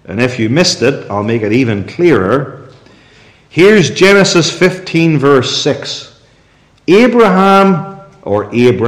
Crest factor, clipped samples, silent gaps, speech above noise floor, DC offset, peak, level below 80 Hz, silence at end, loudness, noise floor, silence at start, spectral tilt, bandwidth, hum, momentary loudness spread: 10 dB; under 0.1%; none; 38 dB; under 0.1%; 0 dBFS; -48 dBFS; 0 s; -10 LUFS; -48 dBFS; 0.1 s; -5 dB/octave; 14.5 kHz; none; 11 LU